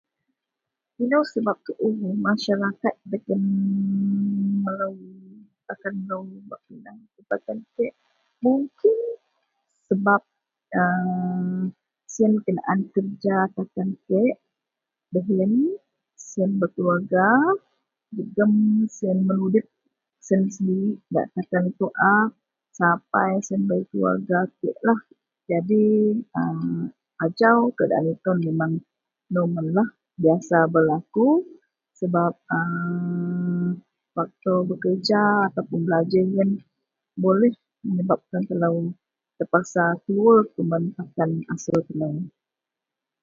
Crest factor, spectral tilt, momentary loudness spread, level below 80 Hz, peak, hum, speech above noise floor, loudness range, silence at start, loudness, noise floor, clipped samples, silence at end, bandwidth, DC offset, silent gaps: 20 dB; -7.5 dB/octave; 12 LU; -68 dBFS; -2 dBFS; none; 65 dB; 4 LU; 1 s; -23 LUFS; -87 dBFS; under 0.1%; 0.95 s; 7.4 kHz; under 0.1%; none